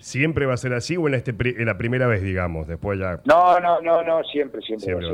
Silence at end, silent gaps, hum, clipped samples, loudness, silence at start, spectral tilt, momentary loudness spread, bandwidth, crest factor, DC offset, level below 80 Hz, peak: 0 s; none; none; under 0.1%; -21 LUFS; 0.05 s; -6.5 dB/octave; 11 LU; 11.5 kHz; 14 dB; under 0.1%; -44 dBFS; -6 dBFS